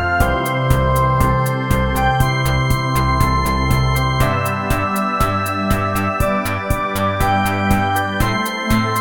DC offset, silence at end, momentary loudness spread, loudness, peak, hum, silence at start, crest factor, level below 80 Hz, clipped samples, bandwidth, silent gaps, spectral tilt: 0.7%; 0 s; 3 LU; -17 LUFS; 0 dBFS; none; 0 s; 16 dB; -26 dBFS; under 0.1%; 19.5 kHz; none; -5.5 dB/octave